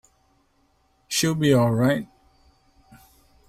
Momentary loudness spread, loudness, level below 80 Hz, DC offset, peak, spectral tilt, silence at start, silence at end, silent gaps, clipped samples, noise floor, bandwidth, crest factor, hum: 9 LU; -21 LUFS; -56 dBFS; under 0.1%; -8 dBFS; -5 dB/octave; 1.1 s; 1.45 s; none; under 0.1%; -65 dBFS; 16 kHz; 18 dB; none